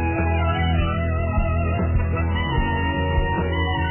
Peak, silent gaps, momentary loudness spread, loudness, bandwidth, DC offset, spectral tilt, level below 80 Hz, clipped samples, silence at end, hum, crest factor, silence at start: -8 dBFS; none; 2 LU; -22 LUFS; 3.2 kHz; under 0.1%; -10.5 dB/octave; -24 dBFS; under 0.1%; 0 s; none; 12 dB; 0 s